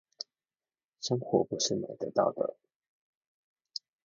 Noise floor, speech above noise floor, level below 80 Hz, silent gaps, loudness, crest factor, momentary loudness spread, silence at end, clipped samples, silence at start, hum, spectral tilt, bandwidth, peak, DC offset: under -90 dBFS; over 59 dB; -74 dBFS; 2.75-2.80 s, 2.88-3.21 s, 3.27-3.56 s; -31 LUFS; 24 dB; 15 LU; 0.25 s; under 0.1%; 1 s; none; -4.5 dB/octave; 7.6 kHz; -12 dBFS; under 0.1%